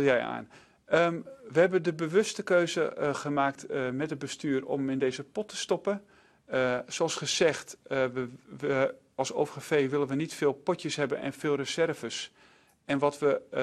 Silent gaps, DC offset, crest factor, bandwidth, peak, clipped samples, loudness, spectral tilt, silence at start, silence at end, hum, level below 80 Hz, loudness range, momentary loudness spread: none; under 0.1%; 20 dB; 13 kHz; -10 dBFS; under 0.1%; -30 LUFS; -4.5 dB/octave; 0 s; 0 s; none; -70 dBFS; 4 LU; 10 LU